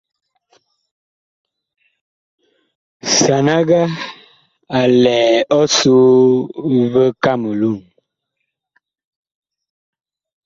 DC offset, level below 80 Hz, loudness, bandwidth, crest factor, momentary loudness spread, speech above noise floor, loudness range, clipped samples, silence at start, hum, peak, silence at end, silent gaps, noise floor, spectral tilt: under 0.1%; -58 dBFS; -13 LUFS; 8 kHz; 16 dB; 11 LU; 63 dB; 9 LU; under 0.1%; 3.05 s; none; -2 dBFS; 2.65 s; none; -76 dBFS; -4.5 dB/octave